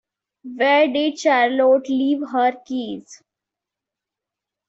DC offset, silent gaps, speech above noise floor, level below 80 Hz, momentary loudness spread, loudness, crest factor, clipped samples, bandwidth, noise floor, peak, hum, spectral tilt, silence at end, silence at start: under 0.1%; none; 67 dB; -70 dBFS; 13 LU; -18 LUFS; 16 dB; under 0.1%; 8 kHz; -86 dBFS; -6 dBFS; none; -3.5 dB/octave; 1.55 s; 0.45 s